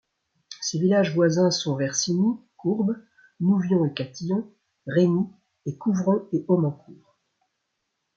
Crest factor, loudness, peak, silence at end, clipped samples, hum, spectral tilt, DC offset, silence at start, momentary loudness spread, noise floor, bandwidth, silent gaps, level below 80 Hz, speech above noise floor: 16 dB; -24 LUFS; -8 dBFS; 1.2 s; under 0.1%; none; -5.5 dB/octave; under 0.1%; 0.5 s; 13 LU; -78 dBFS; 7.6 kHz; none; -70 dBFS; 55 dB